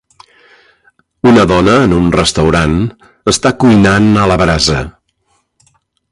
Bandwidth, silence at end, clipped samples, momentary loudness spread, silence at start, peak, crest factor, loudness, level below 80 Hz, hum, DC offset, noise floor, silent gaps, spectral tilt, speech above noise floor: 11.5 kHz; 1.2 s; under 0.1%; 9 LU; 1.25 s; 0 dBFS; 12 dB; -10 LUFS; -28 dBFS; none; under 0.1%; -60 dBFS; none; -5 dB/octave; 51 dB